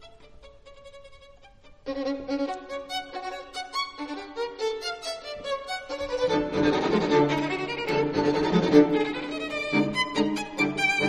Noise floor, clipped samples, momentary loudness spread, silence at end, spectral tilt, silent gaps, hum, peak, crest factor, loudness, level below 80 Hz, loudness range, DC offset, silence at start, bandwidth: -52 dBFS; under 0.1%; 12 LU; 0 s; -5 dB/octave; none; none; -6 dBFS; 22 dB; -27 LUFS; -54 dBFS; 10 LU; under 0.1%; 0 s; 12.5 kHz